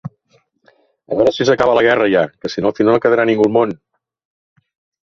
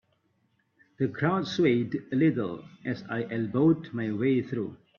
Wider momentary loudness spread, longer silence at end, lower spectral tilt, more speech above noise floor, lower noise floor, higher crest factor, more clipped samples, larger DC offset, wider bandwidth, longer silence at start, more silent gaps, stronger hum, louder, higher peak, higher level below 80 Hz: about the same, 9 LU vs 10 LU; first, 1.3 s vs 0.25 s; second, -6 dB/octave vs -8 dB/octave; about the same, 45 dB vs 44 dB; second, -59 dBFS vs -72 dBFS; about the same, 16 dB vs 18 dB; neither; neither; about the same, 7.4 kHz vs 7 kHz; second, 0.05 s vs 1 s; neither; neither; first, -14 LUFS vs -28 LUFS; first, -2 dBFS vs -12 dBFS; first, -52 dBFS vs -68 dBFS